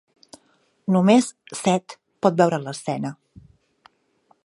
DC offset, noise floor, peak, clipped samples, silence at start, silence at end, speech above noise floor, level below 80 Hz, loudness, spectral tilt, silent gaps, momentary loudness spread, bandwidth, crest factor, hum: under 0.1%; -63 dBFS; -2 dBFS; under 0.1%; 0.9 s; 1.3 s; 43 dB; -66 dBFS; -22 LUFS; -6 dB/octave; none; 13 LU; 11.5 kHz; 22 dB; none